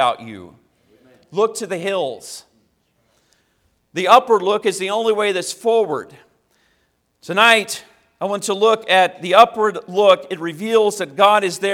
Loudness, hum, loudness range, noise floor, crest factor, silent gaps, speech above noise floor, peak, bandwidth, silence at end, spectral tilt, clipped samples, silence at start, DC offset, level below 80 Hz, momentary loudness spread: -17 LUFS; none; 11 LU; -65 dBFS; 18 dB; none; 48 dB; 0 dBFS; 16.5 kHz; 0 s; -3 dB/octave; under 0.1%; 0 s; under 0.1%; -66 dBFS; 16 LU